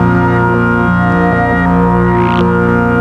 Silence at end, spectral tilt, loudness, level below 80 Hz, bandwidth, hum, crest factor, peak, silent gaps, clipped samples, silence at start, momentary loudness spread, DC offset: 0 s; -9 dB/octave; -11 LUFS; -26 dBFS; 6.2 kHz; 60 Hz at -30 dBFS; 8 dB; -2 dBFS; none; under 0.1%; 0 s; 1 LU; under 0.1%